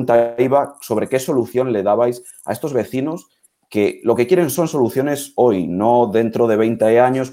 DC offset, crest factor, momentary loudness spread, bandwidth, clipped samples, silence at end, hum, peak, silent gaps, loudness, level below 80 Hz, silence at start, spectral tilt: under 0.1%; 14 dB; 8 LU; 16.5 kHz; under 0.1%; 0 s; none; -2 dBFS; none; -17 LUFS; -60 dBFS; 0 s; -6 dB/octave